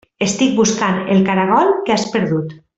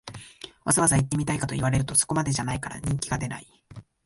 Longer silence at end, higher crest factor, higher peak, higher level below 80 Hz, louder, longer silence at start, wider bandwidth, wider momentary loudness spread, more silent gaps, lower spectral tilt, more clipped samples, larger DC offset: about the same, 0.2 s vs 0.25 s; second, 14 dB vs 22 dB; about the same, -2 dBFS vs -4 dBFS; second, -54 dBFS vs -46 dBFS; first, -15 LUFS vs -25 LUFS; first, 0.2 s vs 0.05 s; second, 8.2 kHz vs 12 kHz; second, 6 LU vs 18 LU; neither; about the same, -5 dB/octave vs -4 dB/octave; neither; neither